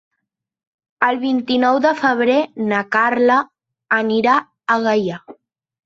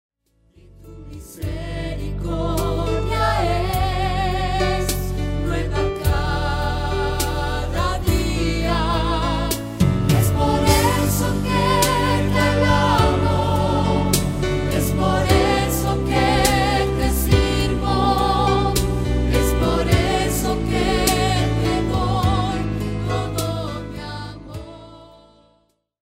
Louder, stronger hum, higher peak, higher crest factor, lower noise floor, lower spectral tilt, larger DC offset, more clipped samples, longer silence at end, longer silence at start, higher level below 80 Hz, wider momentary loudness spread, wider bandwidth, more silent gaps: first, -17 LUFS vs -20 LUFS; neither; about the same, -2 dBFS vs -2 dBFS; about the same, 16 dB vs 18 dB; first, -77 dBFS vs -63 dBFS; about the same, -5.5 dB/octave vs -5 dB/octave; neither; neither; second, 0.55 s vs 1.05 s; first, 1 s vs 0.8 s; second, -64 dBFS vs -26 dBFS; second, 5 LU vs 10 LU; second, 7.6 kHz vs 16.5 kHz; neither